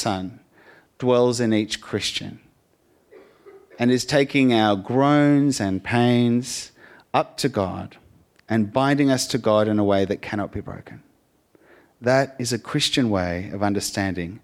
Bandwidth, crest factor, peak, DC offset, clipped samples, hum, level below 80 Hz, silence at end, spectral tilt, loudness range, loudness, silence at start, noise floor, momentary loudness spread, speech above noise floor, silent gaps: 15.5 kHz; 18 dB; -4 dBFS; under 0.1%; under 0.1%; none; -56 dBFS; 0.05 s; -5 dB/octave; 5 LU; -21 LUFS; 0 s; -62 dBFS; 12 LU; 41 dB; none